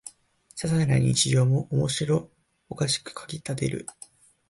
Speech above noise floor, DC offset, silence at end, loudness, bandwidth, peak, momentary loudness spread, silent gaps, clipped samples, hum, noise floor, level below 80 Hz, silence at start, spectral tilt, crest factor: 31 dB; under 0.1%; 0.6 s; -25 LUFS; 11.5 kHz; -10 dBFS; 18 LU; none; under 0.1%; none; -56 dBFS; -54 dBFS; 0.05 s; -5 dB/octave; 16 dB